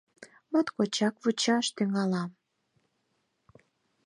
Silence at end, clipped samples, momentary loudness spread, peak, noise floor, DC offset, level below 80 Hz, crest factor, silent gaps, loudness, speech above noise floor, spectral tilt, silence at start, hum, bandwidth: 1.75 s; under 0.1%; 4 LU; -14 dBFS; -76 dBFS; under 0.1%; -80 dBFS; 18 dB; none; -29 LUFS; 49 dB; -4.5 dB/octave; 0.2 s; none; 11.5 kHz